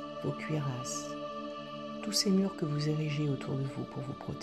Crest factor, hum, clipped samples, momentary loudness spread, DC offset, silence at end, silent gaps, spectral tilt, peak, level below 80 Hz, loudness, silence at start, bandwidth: 18 dB; none; under 0.1%; 11 LU; under 0.1%; 0 s; none; -5 dB/octave; -16 dBFS; -66 dBFS; -34 LUFS; 0 s; 13.5 kHz